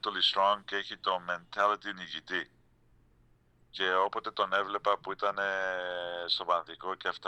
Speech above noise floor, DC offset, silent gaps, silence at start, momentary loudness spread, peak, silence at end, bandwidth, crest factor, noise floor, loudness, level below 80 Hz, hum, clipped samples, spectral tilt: 33 dB; under 0.1%; none; 0.05 s; 8 LU; -12 dBFS; 0 s; 10.5 kHz; 20 dB; -65 dBFS; -31 LUFS; -70 dBFS; none; under 0.1%; -2.5 dB/octave